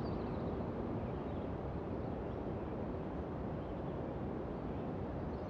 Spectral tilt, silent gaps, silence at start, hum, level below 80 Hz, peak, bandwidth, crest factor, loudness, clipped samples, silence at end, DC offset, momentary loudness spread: -10 dB/octave; none; 0 s; none; -50 dBFS; -28 dBFS; 7 kHz; 12 dB; -42 LUFS; under 0.1%; 0 s; under 0.1%; 2 LU